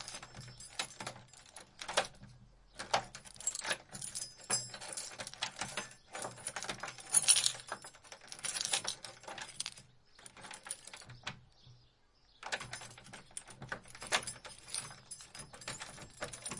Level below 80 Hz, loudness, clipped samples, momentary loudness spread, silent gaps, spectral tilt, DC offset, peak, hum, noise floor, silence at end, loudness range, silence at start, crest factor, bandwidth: -68 dBFS; -37 LUFS; under 0.1%; 17 LU; none; 0 dB/octave; under 0.1%; -8 dBFS; none; -68 dBFS; 0 s; 14 LU; 0 s; 34 dB; 11.5 kHz